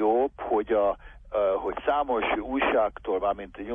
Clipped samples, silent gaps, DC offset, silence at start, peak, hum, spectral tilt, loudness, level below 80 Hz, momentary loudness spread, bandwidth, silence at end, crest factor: under 0.1%; none; under 0.1%; 0 s; -12 dBFS; none; -7.5 dB/octave; -27 LUFS; -50 dBFS; 5 LU; 3.7 kHz; 0 s; 14 dB